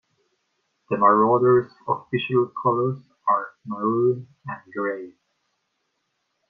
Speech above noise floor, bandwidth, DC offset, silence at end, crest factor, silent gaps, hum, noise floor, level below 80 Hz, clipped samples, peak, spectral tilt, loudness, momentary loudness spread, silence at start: 53 dB; 4.7 kHz; under 0.1%; 1.4 s; 20 dB; none; none; -75 dBFS; -68 dBFS; under 0.1%; -4 dBFS; -9.5 dB/octave; -22 LUFS; 17 LU; 0.9 s